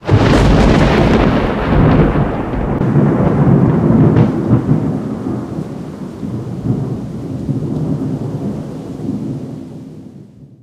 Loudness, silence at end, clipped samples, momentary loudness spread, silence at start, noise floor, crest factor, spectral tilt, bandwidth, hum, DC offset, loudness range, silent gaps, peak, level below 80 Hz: -14 LUFS; 0.15 s; under 0.1%; 15 LU; 0 s; -37 dBFS; 14 dB; -8 dB/octave; 10.5 kHz; none; under 0.1%; 9 LU; none; 0 dBFS; -24 dBFS